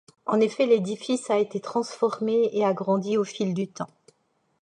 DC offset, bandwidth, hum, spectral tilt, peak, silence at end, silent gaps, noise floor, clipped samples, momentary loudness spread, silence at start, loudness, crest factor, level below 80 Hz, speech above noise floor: under 0.1%; 10.5 kHz; none; -6 dB/octave; -10 dBFS; 0.75 s; none; -70 dBFS; under 0.1%; 7 LU; 0.25 s; -25 LUFS; 16 dB; -78 dBFS; 46 dB